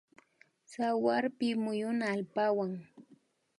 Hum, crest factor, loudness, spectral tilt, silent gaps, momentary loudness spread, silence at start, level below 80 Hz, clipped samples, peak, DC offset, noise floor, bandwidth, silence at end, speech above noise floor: none; 18 dB; -33 LUFS; -6 dB/octave; none; 8 LU; 0.7 s; -84 dBFS; under 0.1%; -16 dBFS; under 0.1%; -67 dBFS; 11.5 kHz; 0.55 s; 35 dB